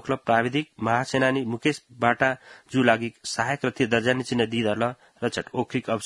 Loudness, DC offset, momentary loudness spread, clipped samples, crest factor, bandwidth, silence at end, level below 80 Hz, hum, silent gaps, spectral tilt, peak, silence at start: -25 LUFS; under 0.1%; 7 LU; under 0.1%; 22 dB; 11.5 kHz; 0 s; -62 dBFS; none; none; -5 dB/octave; -4 dBFS; 0.05 s